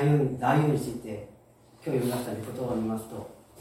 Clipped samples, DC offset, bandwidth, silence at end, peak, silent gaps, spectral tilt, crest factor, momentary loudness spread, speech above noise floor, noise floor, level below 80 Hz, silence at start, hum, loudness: under 0.1%; under 0.1%; 16.5 kHz; 0 s; -12 dBFS; none; -7.5 dB/octave; 18 dB; 17 LU; 28 dB; -56 dBFS; -60 dBFS; 0 s; none; -29 LUFS